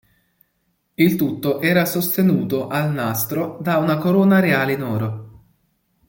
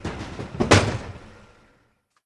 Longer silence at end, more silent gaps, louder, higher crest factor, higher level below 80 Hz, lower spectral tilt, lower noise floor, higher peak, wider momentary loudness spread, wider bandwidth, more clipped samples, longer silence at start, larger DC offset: second, 0.8 s vs 0.95 s; neither; first, -19 LUFS vs -22 LUFS; second, 16 dB vs 24 dB; second, -58 dBFS vs -42 dBFS; first, -6 dB/octave vs -4.5 dB/octave; first, -69 dBFS vs -65 dBFS; about the same, -2 dBFS vs 0 dBFS; second, 9 LU vs 21 LU; first, 17 kHz vs 12 kHz; neither; first, 1 s vs 0 s; neither